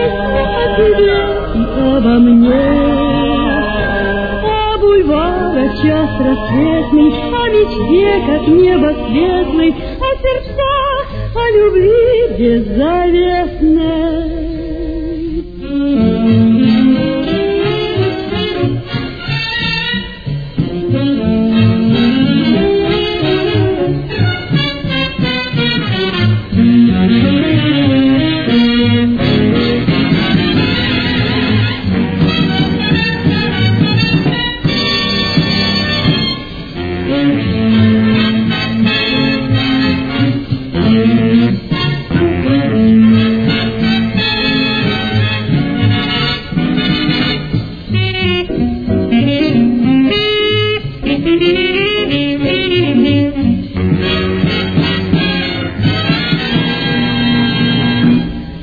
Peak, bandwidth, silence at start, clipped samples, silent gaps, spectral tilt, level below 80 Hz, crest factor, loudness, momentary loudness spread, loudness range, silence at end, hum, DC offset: 0 dBFS; 5 kHz; 0 s; under 0.1%; none; -8 dB/octave; -28 dBFS; 12 dB; -12 LUFS; 7 LU; 3 LU; 0 s; none; under 0.1%